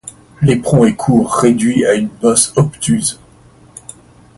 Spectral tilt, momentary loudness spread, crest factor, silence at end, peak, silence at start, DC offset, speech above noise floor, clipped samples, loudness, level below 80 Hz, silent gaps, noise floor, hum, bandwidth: -5.5 dB/octave; 22 LU; 14 dB; 1.25 s; 0 dBFS; 0.05 s; under 0.1%; 32 dB; under 0.1%; -13 LUFS; -44 dBFS; none; -44 dBFS; none; 11.5 kHz